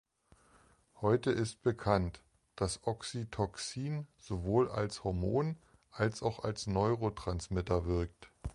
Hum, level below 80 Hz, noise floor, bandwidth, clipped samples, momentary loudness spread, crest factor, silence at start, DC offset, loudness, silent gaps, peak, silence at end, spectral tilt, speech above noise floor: none; -50 dBFS; -67 dBFS; 11.5 kHz; under 0.1%; 9 LU; 22 dB; 0.95 s; under 0.1%; -35 LUFS; none; -14 dBFS; 0 s; -6 dB/octave; 33 dB